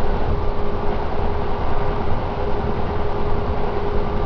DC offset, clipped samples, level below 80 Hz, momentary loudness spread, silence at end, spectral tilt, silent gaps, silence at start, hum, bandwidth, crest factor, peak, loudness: under 0.1%; under 0.1%; -22 dBFS; 1 LU; 0 s; -8.5 dB/octave; none; 0 s; none; 5.4 kHz; 12 dB; -6 dBFS; -24 LUFS